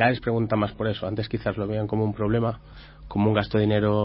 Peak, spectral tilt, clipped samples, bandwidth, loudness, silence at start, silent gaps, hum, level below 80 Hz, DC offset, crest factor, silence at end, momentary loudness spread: -6 dBFS; -11.5 dB/octave; under 0.1%; 5.8 kHz; -25 LUFS; 0 s; none; none; -46 dBFS; under 0.1%; 18 dB; 0 s; 7 LU